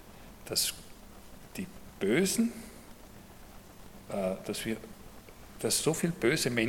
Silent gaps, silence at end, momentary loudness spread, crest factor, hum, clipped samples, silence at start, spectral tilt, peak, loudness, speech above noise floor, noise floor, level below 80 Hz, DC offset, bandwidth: none; 0 s; 24 LU; 22 dB; none; under 0.1%; 0 s; -3.5 dB/octave; -12 dBFS; -31 LUFS; 20 dB; -51 dBFS; -56 dBFS; under 0.1%; 17.5 kHz